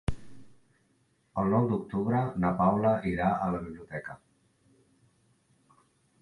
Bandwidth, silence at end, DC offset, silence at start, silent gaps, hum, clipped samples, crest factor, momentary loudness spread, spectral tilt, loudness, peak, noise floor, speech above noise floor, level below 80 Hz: 11 kHz; 2.05 s; under 0.1%; 0.1 s; none; none; under 0.1%; 20 dB; 15 LU; -9.5 dB/octave; -29 LUFS; -10 dBFS; -70 dBFS; 42 dB; -50 dBFS